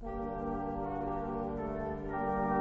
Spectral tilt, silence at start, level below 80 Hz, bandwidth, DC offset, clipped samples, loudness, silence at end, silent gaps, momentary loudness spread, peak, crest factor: -8 dB/octave; 0 s; -48 dBFS; 7.4 kHz; under 0.1%; under 0.1%; -37 LUFS; 0 s; none; 4 LU; -20 dBFS; 14 dB